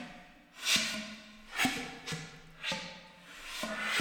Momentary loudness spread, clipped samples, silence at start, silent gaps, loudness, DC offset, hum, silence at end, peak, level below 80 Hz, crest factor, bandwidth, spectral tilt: 21 LU; under 0.1%; 0 s; none; -34 LUFS; under 0.1%; none; 0 s; -12 dBFS; -62 dBFS; 24 dB; 19.5 kHz; -1.5 dB/octave